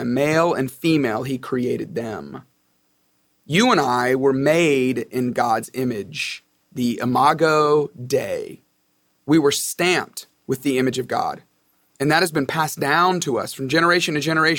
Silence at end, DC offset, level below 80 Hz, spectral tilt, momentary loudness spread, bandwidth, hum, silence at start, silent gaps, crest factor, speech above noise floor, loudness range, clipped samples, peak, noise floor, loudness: 0 s; under 0.1%; -60 dBFS; -4.5 dB/octave; 12 LU; 19 kHz; none; 0 s; none; 18 dB; 46 dB; 3 LU; under 0.1%; -2 dBFS; -66 dBFS; -20 LUFS